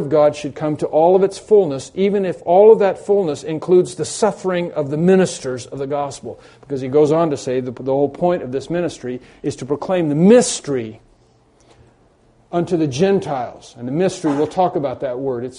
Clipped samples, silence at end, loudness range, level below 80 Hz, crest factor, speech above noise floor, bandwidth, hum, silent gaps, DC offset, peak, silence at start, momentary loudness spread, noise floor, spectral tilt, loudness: under 0.1%; 0 s; 6 LU; -56 dBFS; 18 dB; 37 dB; 10.5 kHz; none; none; under 0.1%; 0 dBFS; 0 s; 13 LU; -54 dBFS; -6 dB/octave; -17 LUFS